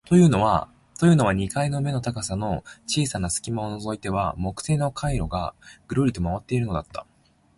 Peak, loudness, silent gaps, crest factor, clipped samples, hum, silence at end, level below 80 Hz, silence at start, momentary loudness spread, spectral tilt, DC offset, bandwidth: -6 dBFS; -24 LUFS; none; 18 dB; under 0.1%; none; 0.55 s; -40 dBFS; 0.05 s; 12 LU; -6 dB/octave; under 0.1%; 11.5 kHz